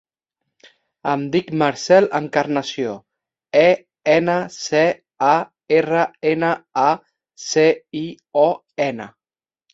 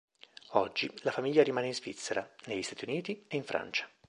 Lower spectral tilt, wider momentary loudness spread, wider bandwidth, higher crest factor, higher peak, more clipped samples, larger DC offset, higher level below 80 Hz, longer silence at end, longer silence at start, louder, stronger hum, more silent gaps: about the same, -5 dB/octave vs -4 dB/octave; about the same, 12 LU vs 10 LU; second, 8 kHz vs 11.5 kHz; second, 18 dB vs 24 dB; first, -2 dBFS vs -10 dBFS; neither; neither; first, -64 dBFS vs -74 dBFS; first, 0.65 s vs 0.2 s; first, 1.05 s vs 0.5 s; first, -19 LUFS vs -33 LUFS; neither; neither